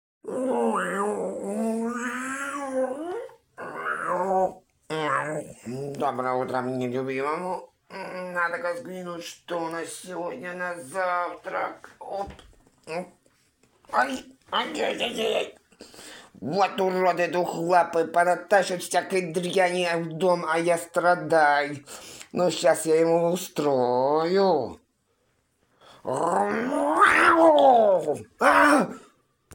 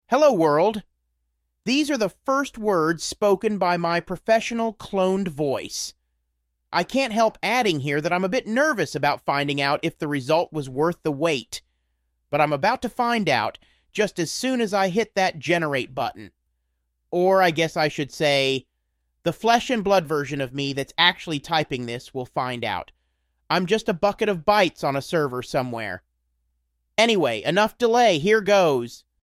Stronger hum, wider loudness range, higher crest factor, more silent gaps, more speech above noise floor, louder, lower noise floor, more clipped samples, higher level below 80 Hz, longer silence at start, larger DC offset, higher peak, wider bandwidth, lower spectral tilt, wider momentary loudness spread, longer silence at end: neither; first, 11 LU vs 3 LU; about the same, 20 dB vs 20 dB; neither; second, 46 dB vs 53 dB; about the same, -24 LUFS vs -22 LUFS; second, -70 dBFS vs -75 dBFS; neither; second, -64 dBFS vs -58 dBFS; first, 0.25 s vs 0.1 s; neither; second, -6 dBFS vs -2 dBFS; about the same, 17 kHz vs 15.5 kHz; about the same, -4.5 dB/octave vs -4.5 dB/octave; first, 16 LU vs 10 LU; second, 0 s vs 0.3 s